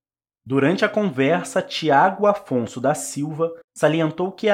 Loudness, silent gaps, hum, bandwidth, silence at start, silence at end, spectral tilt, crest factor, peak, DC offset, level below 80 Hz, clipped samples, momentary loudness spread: -21 LUFS; 3.64-3.68 s; none; 16 kHz; 0.45 s; 0 s; -5 dB/octave; 18 dB; -4 dBFS; under 0.1%; -68 dBFS; under 0.1%; 8 LU